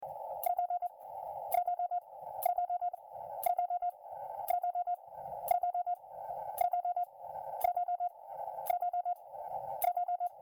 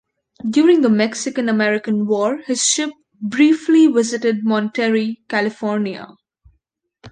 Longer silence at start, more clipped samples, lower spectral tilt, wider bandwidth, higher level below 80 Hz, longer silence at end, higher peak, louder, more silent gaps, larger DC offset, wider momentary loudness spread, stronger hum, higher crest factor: second, 0 s vs 0.45 s; neither; second, -2.5 dB/octave vs -4 dB/octave; first, 19.5 kHz vs 9.8 kHz; second, -76 dBFS vs -64 dBFS; about the same, 0 s vs 0 s; second, -18 dBFS vs -2 dBFS; second, -37 LUFS vs -17 LUFS; neither; neither; about the same, 10 LU vs 10 LU; neither; about the same, 18 dB vs 14 dB